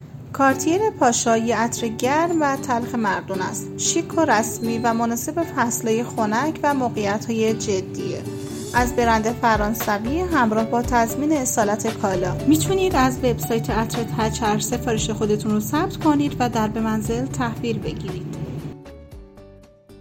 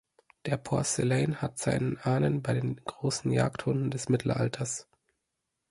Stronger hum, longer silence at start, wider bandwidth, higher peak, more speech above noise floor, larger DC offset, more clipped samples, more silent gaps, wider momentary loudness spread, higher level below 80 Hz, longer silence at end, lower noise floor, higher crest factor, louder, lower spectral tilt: neither; second, 0 s vs 0.45 s; first, 16.5 kHz vs 11.5 kHz; first, -4 dBFS vs -12 dBFS; second, 25 dB vs 54 dB; neither; neither; neither; about the same, 8 LU vs 7 LU; first, -40 dBFS vs -58 dBFS; second, 0 s vs 0.9 s; second, -46 dBFS vs -83 dBFS; about the same, 16 dB vs 18 dB; first, -21 LUFS vs -30 LUFS; about the same, -4.5 dB/octave vs -5.5 dB/octave